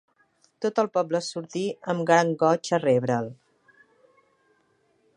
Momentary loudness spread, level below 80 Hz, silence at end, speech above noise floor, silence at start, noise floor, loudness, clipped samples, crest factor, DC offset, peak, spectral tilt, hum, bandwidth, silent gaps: 10 LU; -76 dBFS; 1.85 s; 43 dB; 0.6 s; -67 dBFS; -25 LUFS; under 0.1%; 22 dB; under 0.1%; -6 dBFS; -5.5 dB/octave; none; 10.5 kHz; none